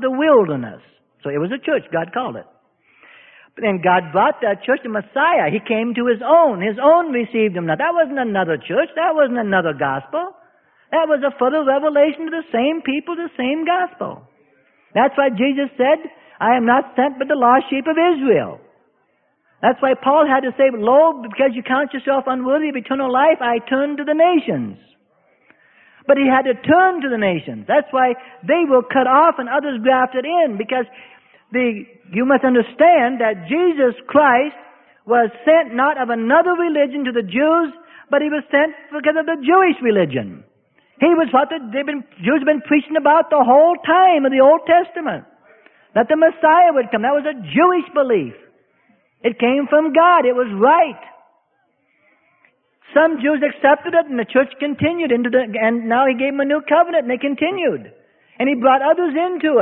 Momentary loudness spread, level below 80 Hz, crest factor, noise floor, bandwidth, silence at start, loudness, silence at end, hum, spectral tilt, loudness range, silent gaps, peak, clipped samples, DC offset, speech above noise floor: 10 LU; -64 dBFS; 16 dB; -64 dBFS; 3.9 kHz; 0 s; -16 LUFS; 0 s; none; -10.5 dB/octave; 4 LU; none; -2 dBFS; under 0.1%; under 0.1%; 48 dB